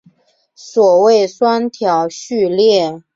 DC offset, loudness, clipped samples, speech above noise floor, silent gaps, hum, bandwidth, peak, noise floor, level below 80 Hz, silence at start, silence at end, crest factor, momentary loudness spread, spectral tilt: under 0.1%; -13 LUFS; under 0.1%; 41 dB; none; none; 7.8 kHz; -2 dBFS; -54 dBFS; -62 dBFS; 0.65 s; 0.15 s; 12 dB; 8 LU; -4.5 dB/octave